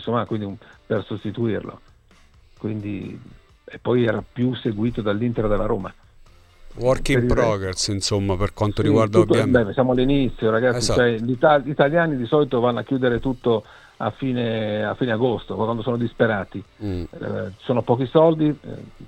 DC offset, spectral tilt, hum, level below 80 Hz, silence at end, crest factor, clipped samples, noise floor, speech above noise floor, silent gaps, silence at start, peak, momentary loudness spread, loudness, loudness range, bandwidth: under 0.1%; -6 dB/octave; none; -38 dBFS; 0 s; 18 dB; under 0.1%; -52 dBFS; 32 dB; none; 0 s; -2 dBFS; 12 LU; -21 LUFS; 8 LU; 13 kHz